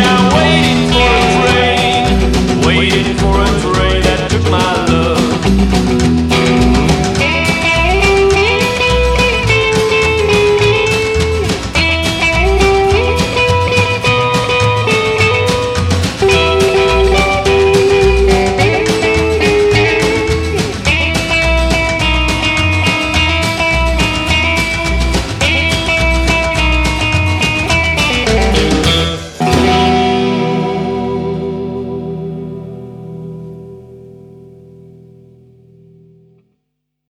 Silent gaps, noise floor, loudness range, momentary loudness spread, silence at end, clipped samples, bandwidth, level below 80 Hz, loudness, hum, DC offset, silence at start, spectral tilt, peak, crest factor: none; -71 dBFS; 4 LU; 6 LU; 2.65 s; under 0.1%; 14.5 kHz; -20 dBFS; -11 LUFS; none; under 0.1%; 0 s; -5 dB/octave; 0 dBFS; 12 dB